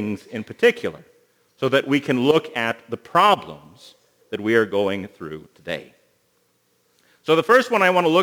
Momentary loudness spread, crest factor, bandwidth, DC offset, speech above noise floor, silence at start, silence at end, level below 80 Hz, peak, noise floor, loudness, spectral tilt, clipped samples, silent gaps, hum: 18 LU; 20 dB; 20 kHz; under 0.1%; 45 dB; 0 s; 0 s; -66 dBFS; -2 dBFS; -65 dBFS; -20 LUFS; -5 dB/octave; under 0.1%; none; 60 Hz at -60 dBFS